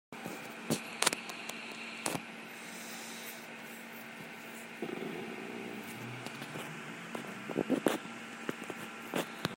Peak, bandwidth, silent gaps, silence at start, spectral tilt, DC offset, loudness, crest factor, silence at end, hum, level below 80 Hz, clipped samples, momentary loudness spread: -4 dBFS; 16.5 kHz; none; 0.1 s; -3 dB/octave; under 0.1%; -39 LUFS; 36 dB; 0 s; none; -80 dBFS; under 0.1%; 13 LU